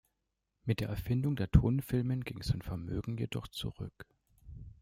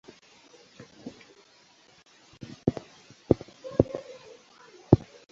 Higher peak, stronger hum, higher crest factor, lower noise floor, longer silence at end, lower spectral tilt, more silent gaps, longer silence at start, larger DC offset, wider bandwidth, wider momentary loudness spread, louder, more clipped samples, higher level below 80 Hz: second, -12 dBFS vs -2 dBFS; neither; second, 24 dB vs 30 dB; first, -84 dBFS vs -59 dBFS; second, 0.1 s vs 0.35 s; second, -7.5 dB/octave vs -9 dB/octave; neither; second, 0.65 s vs 1.05 s; neither; first, 16 kHz vs 7.6 kHz; second, 18 LU vs 27 LU; second, -34 LUFS vs -28 LUFS; neither; about the same, -46 dBFS vs -48 dBFS